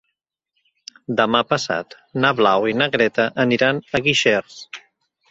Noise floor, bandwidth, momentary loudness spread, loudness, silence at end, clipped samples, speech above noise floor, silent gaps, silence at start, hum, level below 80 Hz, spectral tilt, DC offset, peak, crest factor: -77 dBFS; 8 kHz; 19 LU; -18 LUFS; 0.5 s; under 0.1%; 58 dB; none; 1.1 s; none; -58 dBFS; -4.5 dB/octave; under 0.1%; -2 dBFS; 18 dB